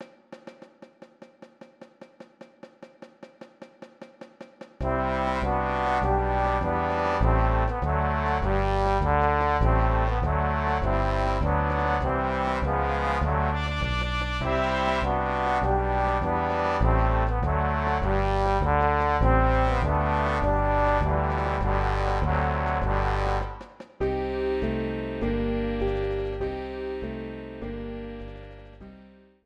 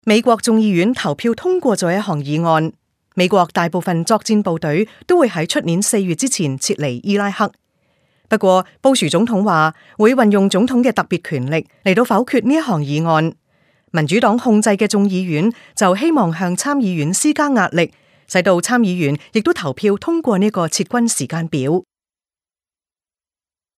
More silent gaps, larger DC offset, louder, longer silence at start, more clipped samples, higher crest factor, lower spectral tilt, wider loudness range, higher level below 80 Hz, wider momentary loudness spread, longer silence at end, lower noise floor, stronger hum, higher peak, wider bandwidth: neither; neither; second, -25 LUFS vs -16 LUFS; about the same, 0 s vs 0.05 s; neither; about the same, 18 dB vs 16 dB; first, -7.5 dB/octave vs -5 dB/octave; first, 7 LU vs 3 LU; first, -30 dBFS vs -62 dBFS; first, 12 LU vs 6 LU; second, 0.45 s vs 1.95 s; second, -52 dBFS vs under -90 dBFS; neither; second, -8 dBFS vs 0 dBFS; second, 8.6 kHz vs 15.5 kHz